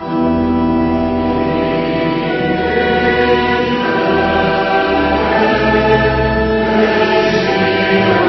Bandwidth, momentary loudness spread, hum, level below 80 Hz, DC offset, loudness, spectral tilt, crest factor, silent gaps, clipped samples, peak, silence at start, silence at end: 6.2 kHz; 4 LU; none; -32 dBFS; under 0.1%; -13 LUFS; -7 dB/octave; 14 dB; none; under 0.1%; 0 dBFS; 0 s; 0 s